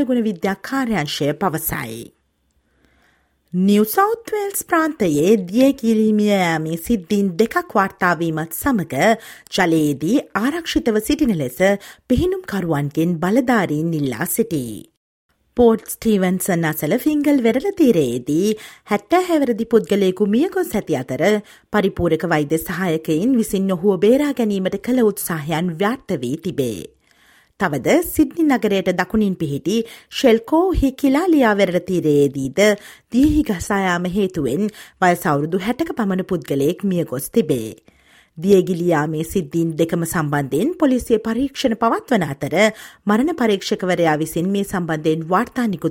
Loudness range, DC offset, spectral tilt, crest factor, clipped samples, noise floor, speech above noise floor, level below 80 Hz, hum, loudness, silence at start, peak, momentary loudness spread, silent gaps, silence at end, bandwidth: 3 LU; under 0.1%; -5.5 dB/octave; 18 dB; under 0.1%; -65 dBFS; 47 dB; -42 dBFS; none; -18 LUFS; 0 s; -2 dBFS; 7 LU; 14.97-15.29 s; 0 s; 17 kHz